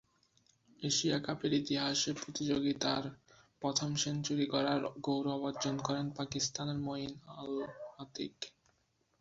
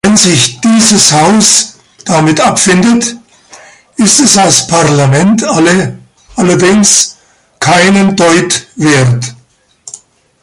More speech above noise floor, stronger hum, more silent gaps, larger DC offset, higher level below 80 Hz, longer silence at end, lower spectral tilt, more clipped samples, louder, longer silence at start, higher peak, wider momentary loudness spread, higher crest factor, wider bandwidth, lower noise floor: first, 41 dB vs 30 dB; neither; neither; neither; second, -70 dBFS vs -42 dBFS; first, 0.7 s vs 0.45 s; about the same, -4 dB/octave vs -3.5 dB/octave; second, under 0.1% vs 0.4%; second, -36 LUFS vs -7 LUFS; first, 0.8 s vs 0.05 s; second, -18 dBFS vs 0 dBFS; about the same, 11 LU vs 13 LU; first, 20 dB vs 8 dB; second, 8 kHz vs 16 kHz; first, -77 dBFS vs -37 dBFS